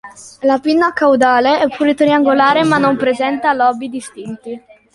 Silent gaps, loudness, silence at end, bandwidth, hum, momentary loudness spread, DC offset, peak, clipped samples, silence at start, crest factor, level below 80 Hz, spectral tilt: none; -13 LUFS; 0.35 s; 11.5 kHz; none; 17 LU; under 0.1%; 0 dBFS; under 0.1%; 0.05 s; 12 dB; -56 dBFS; -5 dB/octave